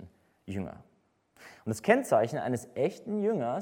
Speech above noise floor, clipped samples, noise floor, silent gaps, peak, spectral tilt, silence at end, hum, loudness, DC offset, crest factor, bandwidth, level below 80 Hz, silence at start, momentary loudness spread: 39 dB; under 0.1%; -69 dBFS; none; -8 dBFS; -6 dB/octave; 0 s; none; -30 LUFS; under 0.1%; 24 dB; 17 kHz; -68 dBFS; 0 s; 15 LU